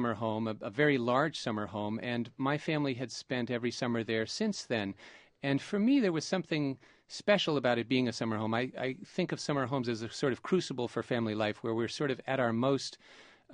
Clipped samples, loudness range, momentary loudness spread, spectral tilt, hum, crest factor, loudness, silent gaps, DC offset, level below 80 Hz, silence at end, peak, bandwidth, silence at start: under 0.1%; 3 LU; 8 LU; -5.5 dB/octave; none; 20 dB; -33 LUFS; none; under 0.1%; -72 dBFS; 0 s; -12 dBFS; 10 kHz; 0 s